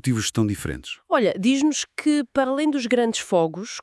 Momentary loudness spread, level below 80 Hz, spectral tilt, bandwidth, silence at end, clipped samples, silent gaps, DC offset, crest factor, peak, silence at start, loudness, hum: 6 LU; -52 dBFS; -4.5 dB/octave; 12 kHz; 0 s; under 0.1%; none; under 0.1%; 14 dB; -8 dBFS; 0.05 s; -22 LUFS; none